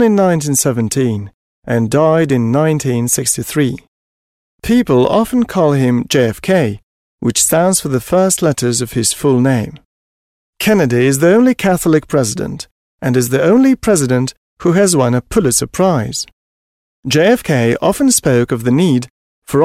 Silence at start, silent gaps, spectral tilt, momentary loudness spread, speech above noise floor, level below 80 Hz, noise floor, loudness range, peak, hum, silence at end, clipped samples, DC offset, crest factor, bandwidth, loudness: 0 s; 1.34-1.62 s, 3.88-4.58 s, 6.83-7.18 s, 9.85-10.53 s, 12.71-12.98 s, 14.37-14.57 s, 16.32-17.03 s, 19.10-19.42 s; -5 dB/octave; 10 LU; over 77 dB; -42 dBFS; under -90 dBFS; 2 LU; 0 dBFS; none; 0 s; under 0.1%; under 0.1%; 12 dB; 16 kHz; -13 LUFS